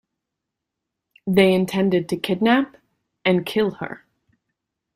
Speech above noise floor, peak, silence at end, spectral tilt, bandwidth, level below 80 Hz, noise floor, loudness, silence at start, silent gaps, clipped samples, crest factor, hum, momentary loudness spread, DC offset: 63 dB; -4 dBFS; 1 s; -6.5 dB/octave; 15.5 kHz; -60 dBFS; -83 dBFS; -20 LUFS; 1.25 s; none; under 0.1%; 18 dB; none; 16 LU; under 0.1%